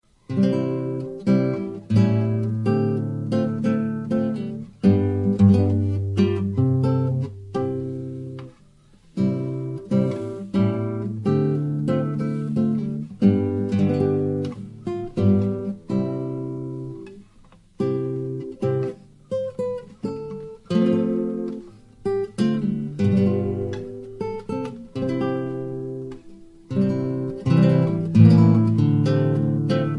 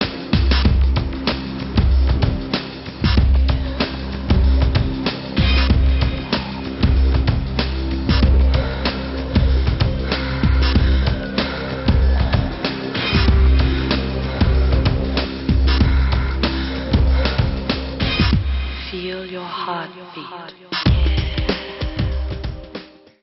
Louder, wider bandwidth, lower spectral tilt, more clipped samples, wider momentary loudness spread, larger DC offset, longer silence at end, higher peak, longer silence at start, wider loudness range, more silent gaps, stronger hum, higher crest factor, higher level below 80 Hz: second, -23 LUFS vs -19 LUFS; first, 10 kHz vs 6 kHz; first, -9.5 dB/octave vs -5 dB/octave; neither; first, 13 LU vs 10 LU; neither; second, 0 s vs 0.4 s; about the same, -2 dBFS vs -2 dBFS; first, 0.3 s vs 0 s; first, 8 LU vs 5 LU; neither; neither; about the same, 20 dB vs 16 dB; second, -54 dBFS vs -20 dBFS